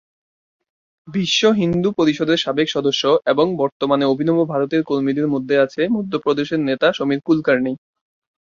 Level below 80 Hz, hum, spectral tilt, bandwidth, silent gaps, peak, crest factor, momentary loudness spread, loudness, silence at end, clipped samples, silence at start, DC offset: -58 dBFS; none; -5.5 dB/octave; 7.4 kHz; 3.72-3.80 s; -2 dBFS; 16 dB; 4 LU; -18 LUFS; 0.7 s; under 0.1%; 1.05 s; under 0.1%